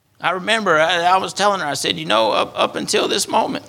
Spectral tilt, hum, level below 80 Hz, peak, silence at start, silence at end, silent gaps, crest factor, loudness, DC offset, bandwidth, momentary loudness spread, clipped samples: -2.5 dB/octave; none; -60 dBFS; 0 dBFS; 0.2 s; 0 s; none; 18 dB; -17 LUFS; under 0.1%; 17 kHz; 5 LU; under 0.1%